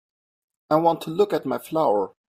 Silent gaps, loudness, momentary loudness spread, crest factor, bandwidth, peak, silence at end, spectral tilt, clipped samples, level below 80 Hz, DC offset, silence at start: none; -23 LUFS; 5 LU; 18 dB; 16 kHz; -6 dBFS; 0.2 s; -6.5 dB/octave; under 0.1%; -68 dBFS; under 0.1%; 0.7 s